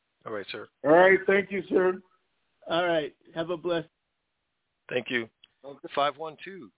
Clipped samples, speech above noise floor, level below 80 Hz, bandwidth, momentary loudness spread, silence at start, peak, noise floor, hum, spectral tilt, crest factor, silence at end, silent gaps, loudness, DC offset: under 0.1%; 54 dB; -68 dBFS; 4 kHz; 19 LU; 0.25 s; -8 dBFS; -80 dBFS; none; -8.5 dB/octave; 20 dB; 0.1 s; none; -26 LUFS; under 0.1%